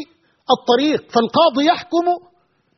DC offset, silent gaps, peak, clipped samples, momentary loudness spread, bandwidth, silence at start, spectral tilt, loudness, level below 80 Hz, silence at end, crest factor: under 0.1%; none; -2 dBFS; under 0.1%; 7 LU; 6.4 kHz; 0 s; -2 dB/octave; -17 LUFS; -64 dBFS; 0.6 s; 16 dB